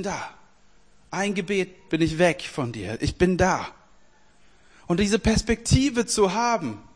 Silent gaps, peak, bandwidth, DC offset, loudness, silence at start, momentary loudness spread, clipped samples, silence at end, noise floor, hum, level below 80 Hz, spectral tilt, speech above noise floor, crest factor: none; -6 dBFS; 10.5 kHz; 0.2%; -24 LUFS; 0 s; 9 LU; under 0.1%; 0.15 s; -59 dBFS; none; -40 dBFS; -5 dB/octave; 36 dB; 18 dB